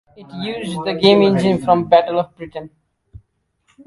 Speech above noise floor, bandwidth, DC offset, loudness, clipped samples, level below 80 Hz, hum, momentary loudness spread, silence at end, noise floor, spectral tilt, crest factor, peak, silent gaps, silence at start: 48 dB; 11.5 kHz; under 0.1%; -16 LUFS; under 0.1%; -52 dBFS; none; 19 LU; 0.7 s; -64 dBFS; -6.5 dB/octave; 18 dB; 0 dBFS; none; 0.2 s